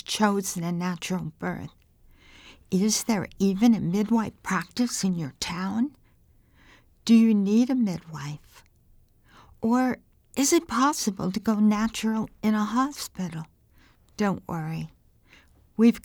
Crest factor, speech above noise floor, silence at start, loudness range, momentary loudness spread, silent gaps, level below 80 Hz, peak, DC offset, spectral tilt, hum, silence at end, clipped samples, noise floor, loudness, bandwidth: 18 dB; 35 dB; 0.1 s; 4 LU; 14 LU; none; -58 dBFS; -8 dBFS; under 0.1%; -5 dB/octave; none; 0.05 s; under 0.1%; -59 dBFS; -25 LUFS; 19.5 kHz